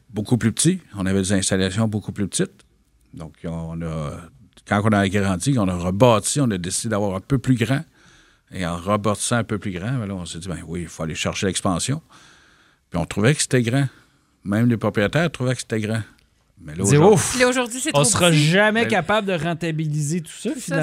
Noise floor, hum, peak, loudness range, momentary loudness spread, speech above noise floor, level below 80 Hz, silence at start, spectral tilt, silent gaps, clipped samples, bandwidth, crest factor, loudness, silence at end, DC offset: -56 dBFS; none; 0 dBFS; 8 LU; 14 LU; 36 dB; -48 dBFS; 0.1 s; -4.5 dB/octave; none; under 0.1%; 16 kHz; 22 dB; -21 LUFS; 0 s; under 0.1%